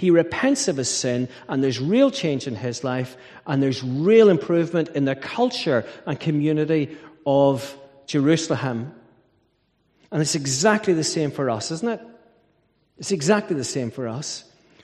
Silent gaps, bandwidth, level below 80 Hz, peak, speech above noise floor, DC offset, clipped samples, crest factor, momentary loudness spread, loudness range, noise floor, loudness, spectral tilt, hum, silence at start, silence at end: none; 13.5 kHz; -64 dBFS; -4 dBFS; 45 dB; under 0.1%; under 0.1%; 20 dB; 12 LU; 4 LU; -67 dBFS; -22 LUFS; -5 dB/octave; none; 0 s; 0.45 s